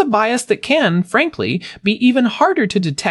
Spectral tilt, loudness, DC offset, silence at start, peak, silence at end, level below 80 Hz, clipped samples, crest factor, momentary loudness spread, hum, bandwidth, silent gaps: -5 dB/octave; -16 LUFS; under 0.1%; 0 s; -2 dBFS; 0 s; -58 dBFS; under 0.1%; 14 dB; 6 LU; none; 12 kHz; none